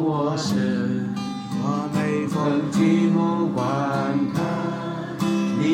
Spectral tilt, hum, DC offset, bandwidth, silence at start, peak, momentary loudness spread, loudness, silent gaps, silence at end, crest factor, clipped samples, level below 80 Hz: -6.5 dB/octave; none; under 0.1%; 15.5 kHz; 0 s; -8 dBFS; 8 LU; -23 LUFS; none; 0 s; 14 dB; under 0.1%; -62 dBFS